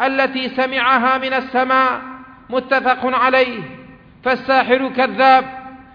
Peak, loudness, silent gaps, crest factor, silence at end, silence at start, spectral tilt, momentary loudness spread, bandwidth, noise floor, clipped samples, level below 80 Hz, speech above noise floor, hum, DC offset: 0 dBFS; -16 LUFS; none; 16 dB; 0.1 s; 0 s; -5.5 dB/octave; 13 LU; 5.4 kHz; -41 dBFS; under 0.1%; -54 dBFS; 25 dB; none; under 0.1%